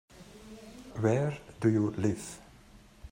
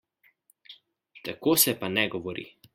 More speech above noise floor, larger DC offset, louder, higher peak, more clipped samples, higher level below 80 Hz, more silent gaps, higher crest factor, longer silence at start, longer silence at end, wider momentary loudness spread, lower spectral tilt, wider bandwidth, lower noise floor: second, 27 dB vs 39 dB; neither; second, -31 LUFS vs -25 LUFS; second, -14 dBFS vs -6 dBFS; neither; first, -58 dBFS vs -68 dBFS; neither; about the same, 20 dB vs 24 dB; second, 0.15 s vs 0.7 s; second, 0.05 s vs 0.25 s; first, 21 LU vs 18 LU; first, -7 dB/octave vs -2.5 dB/octave; about the same, 16 kHz vs 16 kHz; second, -56 dBFS vs -65 dBFS